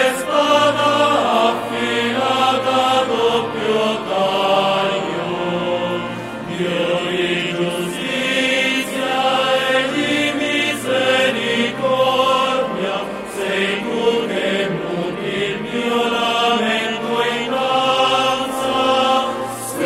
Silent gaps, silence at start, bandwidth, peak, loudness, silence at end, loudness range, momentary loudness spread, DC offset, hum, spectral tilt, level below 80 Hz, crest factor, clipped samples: none; 0 s; 16 kHz; -2 dBFS; -17 LUFS; 0 s; 3 LU; 7 LU; under 0.1%; none; -3.5 dB/octave; -54 dBFS; 16 dB; under 0.1%